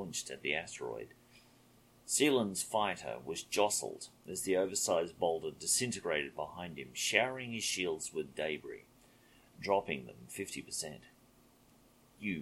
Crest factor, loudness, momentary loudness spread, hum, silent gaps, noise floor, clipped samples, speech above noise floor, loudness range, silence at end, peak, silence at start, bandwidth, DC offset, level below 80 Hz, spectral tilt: 28 dB; -35 LUFS; 14 LU; none; none; -65 dBFS; under 0.1%; 29 dB; 7 LU; 0 s; -10 dBFS; 0 s; 16.5 kHz; under 0.1%; -70 dBFS; -2.5 dB/octave